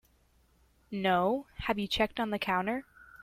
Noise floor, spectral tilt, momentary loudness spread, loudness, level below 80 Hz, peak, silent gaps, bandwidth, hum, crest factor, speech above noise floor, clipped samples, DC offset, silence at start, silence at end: -67 dBFS; -5.5 dB/octave; 7 LU; -31 LUFS; -56 dBFS; -16 dBFS; none; 16 kHz; none; 18 dB; 36 dB; under 0.1%; under 0.1%; 0.9 s; 0.05 s